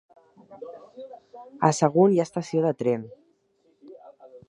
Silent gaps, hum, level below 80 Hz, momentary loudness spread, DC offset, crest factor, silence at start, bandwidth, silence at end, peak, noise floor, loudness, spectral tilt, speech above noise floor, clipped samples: none; none; -70 dBFS; 24 LU; under 0.1%; 22 dB; 0.5 s; 11 kHz; 0.1 s; -4 dBFS; -66 dBFS; -23 LUFS; -6.5 dB/octave; 44 dB; under 0.1%